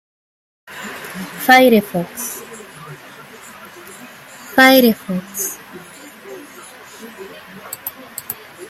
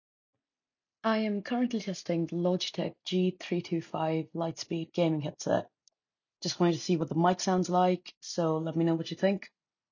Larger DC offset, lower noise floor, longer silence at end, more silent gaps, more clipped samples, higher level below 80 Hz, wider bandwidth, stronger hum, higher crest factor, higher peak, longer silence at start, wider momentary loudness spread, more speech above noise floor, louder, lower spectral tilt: neither; second, -39 dBFS vs under -90 dBFS; second, 0.05 s vs 0.45 s; second, none vs 8.17-8.21 s; neither; first, -62 dBFS vs -74 dBFS; first, 16 kHz vs 7.4 kHz; neither; about the same, 20 dB vs 20 dB; first, 0 dBFS vs -12 dBFS; second, 0.7 s vs 1.05 s; first, 27 LU vs 8 LU; second, 24 dB vs over 60 dB; first, -15 LUFS vs -31 LUFS; second, -3.5 dB/octave vs -6 dB/octave